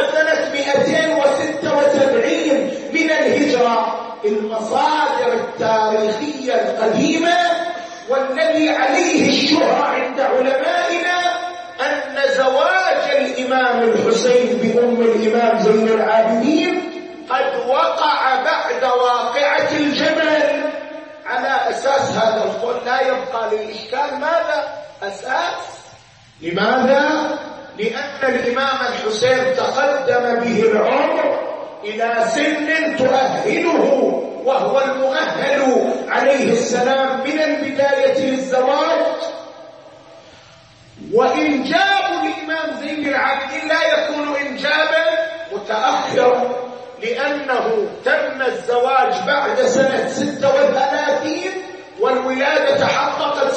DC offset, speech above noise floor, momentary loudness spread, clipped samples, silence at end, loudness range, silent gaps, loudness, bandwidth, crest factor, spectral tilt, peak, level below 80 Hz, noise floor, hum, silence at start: under 0.1%; 28 dB; 8 LU; under 0.1%; 0 s; 4 LU; none; -17 LUFS; 8.8 kHz; 14 dB; -4 dB/octave; -2 dBFS; -64 dBFS; -45 dBFS; none; 0 s